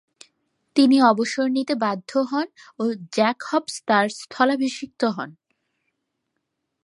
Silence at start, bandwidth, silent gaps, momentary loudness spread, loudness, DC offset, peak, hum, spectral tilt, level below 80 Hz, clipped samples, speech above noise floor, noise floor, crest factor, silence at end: 0.75 s; 11.5 kHz; none; 10 LU; -22 LUFS; under 0.1%; -4 dBFS; none; -4.5 dB/octave; -76 dBFS; under 0.1%; 57 dB; -78 dBFS; 20 dB; 1.55 s